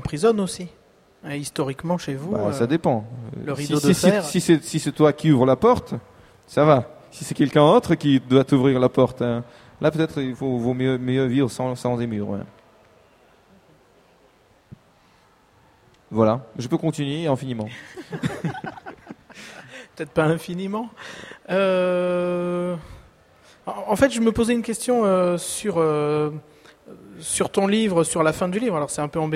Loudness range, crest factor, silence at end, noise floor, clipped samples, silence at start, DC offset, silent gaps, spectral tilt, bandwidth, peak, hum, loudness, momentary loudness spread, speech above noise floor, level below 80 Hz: 9 LU; 20 dB; 0 s; -57 dBFS; under 0.1%; 0 s; under 0.1%; none; -6 dB/octave; 16 kHz; -2 dBFS; none; -21 LUFS; 18 LU; 36 dB; -52 dBFS